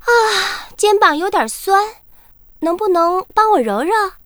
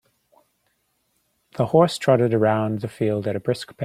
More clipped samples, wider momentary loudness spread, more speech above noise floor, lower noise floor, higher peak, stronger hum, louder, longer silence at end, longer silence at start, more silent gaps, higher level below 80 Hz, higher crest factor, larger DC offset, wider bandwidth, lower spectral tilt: neither; about the same, 8 LU vs 9 LU; second, 30 dB vs 49 dB; second, -45 dBFS vs -70 dBFS; first, 0 dBFS vs -4 dBFS; neither; first, -15 LUFS vs -21 LUFS; first, 0.15 s vs 0 s; second, 0.05 s vs 1.55 s; neither; first, -48 dBFS vs -62 dBFS; about the same, 16 dB vs 20 dB; neither; first, over 20 kHz vs 15 kHz; second, -2 dB/octave vs -7 dB/octave